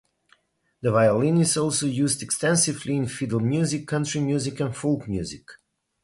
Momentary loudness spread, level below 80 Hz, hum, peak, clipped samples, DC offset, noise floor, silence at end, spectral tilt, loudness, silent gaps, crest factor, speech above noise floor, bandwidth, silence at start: 8 LU; -54 dBFS; none; -8 dBFS; under 0.1%; under 0.1%; -64 dBFS; 0.5 s; -5 dB/octave; -23 LUFS; none; 16 dB; 41 dB; 11.5 kHz; 0.85 s